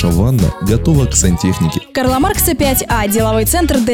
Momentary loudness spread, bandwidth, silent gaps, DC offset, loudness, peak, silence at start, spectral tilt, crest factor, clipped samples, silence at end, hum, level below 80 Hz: 3 LU; 19 kHz; none; under 0.1%; -13 LUFS; 0 dBFS; 0 s; -5 dB/octave; 12 dB; under 0.1%; 0 s; none; -22 dBFS